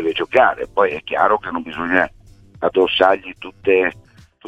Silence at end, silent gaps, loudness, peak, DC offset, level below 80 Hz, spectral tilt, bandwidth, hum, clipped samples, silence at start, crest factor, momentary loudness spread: 0 s; none; -18 LUFS; 0 dBFS; under 0.1%; -50 dBFS; -5.5 dB/octave; 8.4 kHz; none; under 0.1%; 0 s; 18 dB; 10 LU